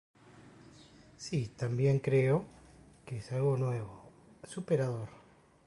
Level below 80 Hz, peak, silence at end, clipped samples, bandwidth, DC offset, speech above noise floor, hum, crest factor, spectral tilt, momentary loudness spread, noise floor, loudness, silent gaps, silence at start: -64 dBFS; -18 dBFS; 0.5 s; under 0.1%; 11.5 kHz; under 0.1%; 26 dB; none; 16 dB; -7.5 dB/octave; 19 LU; -58 dBFS; -33 LUFS; none; 0.35 s